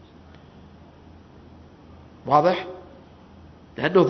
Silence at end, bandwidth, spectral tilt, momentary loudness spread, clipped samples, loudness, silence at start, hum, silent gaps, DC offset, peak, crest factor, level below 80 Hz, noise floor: 0 s; 6.4 kHz; -7.5 dB/octave; 29 LU; under 0.1%; -22 LUFS; 2.25 s; none; none; under 0.1%; -2 dBFS; 24 dB; -56 dBFS; -48 dBFS